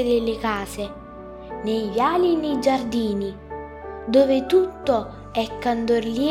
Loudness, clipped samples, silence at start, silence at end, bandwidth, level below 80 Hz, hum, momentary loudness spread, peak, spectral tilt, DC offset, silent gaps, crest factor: -22 LUFS; under 0.1%; 0 s; 0 s; 16.5 kHz; -46 dBFS; none; 17 LU; -6 dBFS; -5.5 dB/octave; under 0.1%; none; 16 dB